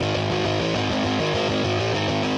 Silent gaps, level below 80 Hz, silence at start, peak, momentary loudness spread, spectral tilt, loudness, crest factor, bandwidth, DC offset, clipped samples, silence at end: none; -48 dBFS; 0 s; -12 dBFS; 1 LU; -5 dB/octave; -23 LUFS; 12 dB; 10.5 kHz; under 0.1%; under 0.1%; 0 s